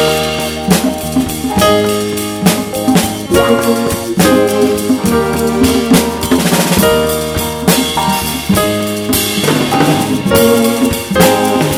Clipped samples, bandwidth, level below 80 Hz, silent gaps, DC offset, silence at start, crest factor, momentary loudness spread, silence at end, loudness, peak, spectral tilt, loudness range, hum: 0.1%; over 20 kHz; -32 dBFS; none; under 0.1%; 0 s; 12 dB; 6 LU; 0 s; -12 LUFS; 0 dBFS; -4.5 dB/octave; 1 LU; none